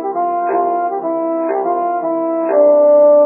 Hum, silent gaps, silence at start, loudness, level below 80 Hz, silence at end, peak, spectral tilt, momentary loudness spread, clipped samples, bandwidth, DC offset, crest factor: none; none; 0 s; -14 LUFS; under -90 dBFS; 0 s; -2 dBFS; -10.5 dB/octave; 9 LU; under 0.1%; 2.8 kHz; under 0.1%; 12 dB